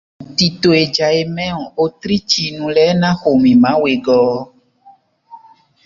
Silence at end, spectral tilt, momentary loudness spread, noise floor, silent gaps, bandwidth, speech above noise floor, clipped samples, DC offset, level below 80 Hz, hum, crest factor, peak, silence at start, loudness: 0.5 s; -5.5 dB/octave; 9 LU; -48 dBFS; none; 7.6 kHz; 34 dB; under 0.1%; under 0.1%; -50 dBFS; none; 14 dB; 0 dBFS; 0.2 s; -14 LUFS